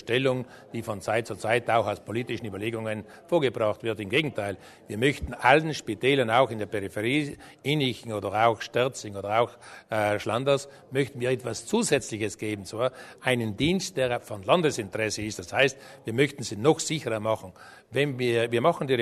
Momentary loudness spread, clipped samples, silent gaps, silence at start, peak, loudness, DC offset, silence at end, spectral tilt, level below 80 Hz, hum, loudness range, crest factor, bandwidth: 9 LU; under 0.1%; none; 0.05 s; -4 dBFS; -27 LUFS; under 0.1%; 0 s; -4.5 dB/octave; -56 dBFS; none; 3 LU; 22 dB; 13.5 kHz